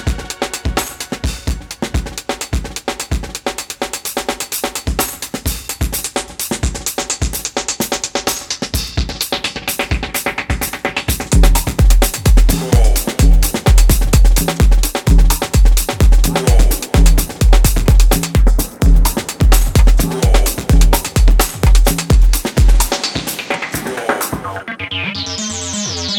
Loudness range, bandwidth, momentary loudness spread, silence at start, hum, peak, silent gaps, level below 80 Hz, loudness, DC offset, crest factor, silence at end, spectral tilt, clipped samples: 7 LU; 18.5 kHz; 9 LU; 0 s; none; 0 dBFS; none; -14 dBFS; -16 LUFS; under 0.1%; 12 dB; 0 s; -4 dB/octave; under 0.1%